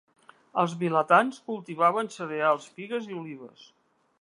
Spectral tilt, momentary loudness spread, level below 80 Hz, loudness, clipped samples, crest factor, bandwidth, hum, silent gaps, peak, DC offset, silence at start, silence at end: -6 dB/octave; 16 LU; -80 dBFS; -26 LUFS; under 0.1%; 22 dB; 11 kHz; none; none; -6 dBFS; under 0.1%; 0.55 s; 0.75 s